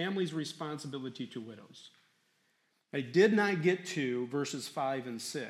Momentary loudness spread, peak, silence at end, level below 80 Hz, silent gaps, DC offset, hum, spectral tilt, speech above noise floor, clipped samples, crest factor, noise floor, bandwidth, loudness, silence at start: 16 LU; -12 dBFS; 0 s; -86 dBFS; none; under 0.1%; none; -5 dB/octave; 42 dB; under 0.1%; 22 dB; -76 dBFS; 14 kHz; -33 LUFS; 0 s